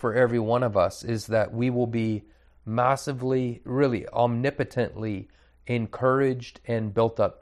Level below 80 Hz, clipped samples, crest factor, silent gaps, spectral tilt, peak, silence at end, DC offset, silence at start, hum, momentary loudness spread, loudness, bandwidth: -56 dBFS; under 0.1%; 18 dB; none; -7 dB/octave; -8 dBFS; 0.1 s; under 0.1%; 0 s; none; 9 LU; -26 LUFS; 13 kHz